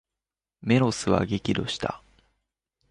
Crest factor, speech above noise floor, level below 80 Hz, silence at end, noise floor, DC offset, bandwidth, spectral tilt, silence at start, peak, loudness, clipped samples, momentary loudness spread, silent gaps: 22 dB; 65 dB; -50 dBFS; 0.95 s; -90 dBFS; under 0.1%; 11.5 kHz; -5.5 dB/octave; 0.65 s; -6 dBFS; -25 LUFS; under 0.1%; 12 LU; none